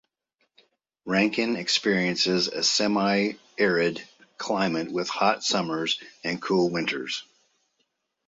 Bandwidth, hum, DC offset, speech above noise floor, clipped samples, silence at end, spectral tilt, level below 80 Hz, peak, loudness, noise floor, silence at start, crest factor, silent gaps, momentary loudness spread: 8 kHz; none; under 0.1%; 50 dB; under 0.1%; 1.05 s; -3.5 dB/octave; -68 dBFS; -8 dBFS; -25 LUFS; -75 dBFS; 1.05 s; 20 dB; none; 9 LU